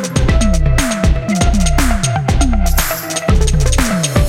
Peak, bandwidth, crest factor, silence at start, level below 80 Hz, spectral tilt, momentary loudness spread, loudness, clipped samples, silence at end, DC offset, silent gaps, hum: 0 dBFS; 16.5 kHz; 12 dB; 0 s; -14 dBFS; -4.5 dB/octave; 2 LU; -14 LUFS; under 0.1%; 0 s; under 0.1%; none; none